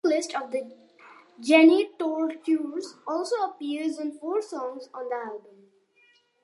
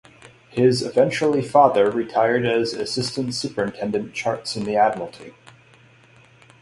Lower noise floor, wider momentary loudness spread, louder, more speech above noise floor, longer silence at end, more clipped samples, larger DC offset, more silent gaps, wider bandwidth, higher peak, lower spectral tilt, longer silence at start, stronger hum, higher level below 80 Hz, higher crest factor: first, -63 dBFS vs -52 dBFS; first, 18 LU vs 10 LU; second, -26 LUFS vs -21 LUFS; first, 38 dB vs 32 dB; second, 1.05 s vs 1.3 s; neither; neither; neither; about the same, 11.5 kHz vs 11.5 kHz; about the same, -4 dBFS vs -2 dBFS; second, -3 dB/octave vs -5 dB/octave; second, 0.05 s vs 0.55 s; neither; second, -86 dBFS vs -60 dBFS; about the same, 22 dB vs 20 dB